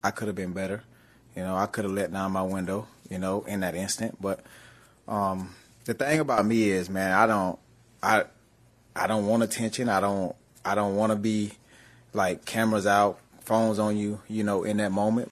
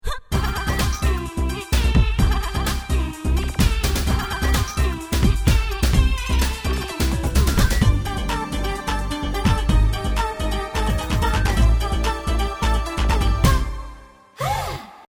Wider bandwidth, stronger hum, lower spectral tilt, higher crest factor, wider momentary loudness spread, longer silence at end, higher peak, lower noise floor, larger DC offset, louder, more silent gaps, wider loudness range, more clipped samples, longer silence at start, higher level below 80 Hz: second, 13.5 kHz vs over 20 kHz; neither; about the same, -5 dB/octave vs -5 dB/octave; first, 22 dB vs 16 dB; first, 12 LU vs 6 LU; about the same, 0 s vs 0.05 s; second, -6 dBFS vs -2 dBFS; first, -60 dBFS vs -43 dBFS; neither; second, -27 LUFS vs -22 LUFS; neither; first, 5 LU vs 2 LU; neither; about the same, 0.05 s vs 0.05 s; second, -64 dBFS vs -22 dBFS